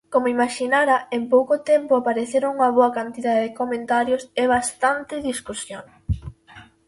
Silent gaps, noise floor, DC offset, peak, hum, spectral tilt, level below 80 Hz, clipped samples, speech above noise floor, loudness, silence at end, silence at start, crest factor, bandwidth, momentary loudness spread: none; -47 dBFS; under 0.1%; -4 dBFS; none; -4.5 dB/octave; -42 dBFS; under 0.1%; 27 dB; -21 LUFS; 0.25 s; 0.1 s; 16 dB; 11.5 kHz; 11 LU